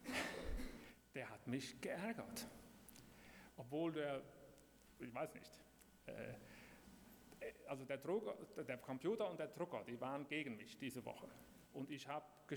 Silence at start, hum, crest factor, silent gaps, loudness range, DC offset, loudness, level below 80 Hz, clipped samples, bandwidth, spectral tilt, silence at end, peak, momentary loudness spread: 0 s; none; 18 dB; none; 6 LU; under 0.1%; -49 LUFS; -64 dBFS; under 0.1%; over 20 kHz; -5 dB/octave; 0 s; -30 dBFS; 18 LU